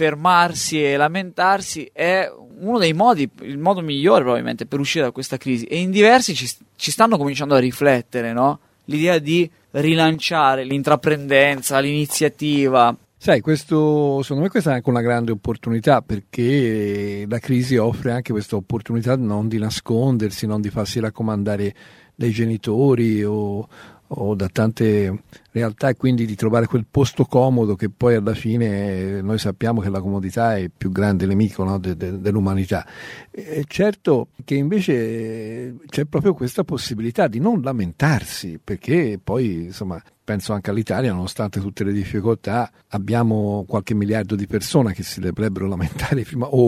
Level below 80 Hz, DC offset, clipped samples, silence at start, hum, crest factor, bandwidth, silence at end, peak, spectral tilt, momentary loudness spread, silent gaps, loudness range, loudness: -48 dBFS; under 0.1%; under 0.1%; 0 s; none; 18 dB; 16 kHz; 0 s; 0 dBFS; -6 dB/octave; 10 LU; none; 5 LU; -20 LUFS